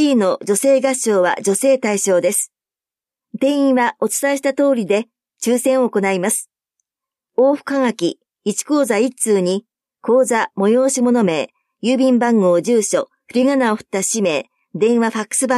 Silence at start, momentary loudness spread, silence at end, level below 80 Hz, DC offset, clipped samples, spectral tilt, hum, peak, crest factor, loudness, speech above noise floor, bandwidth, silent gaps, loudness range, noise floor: 0 s; 8 LU; 0 s; -72 dBFS; under 0.1%; under 0.1%; -4 dB/octave; none; -4 dBFS; 14 dB; -17 LUFS; over 74 dB; 15 kHz; none; 3 LU; under -90 dBFS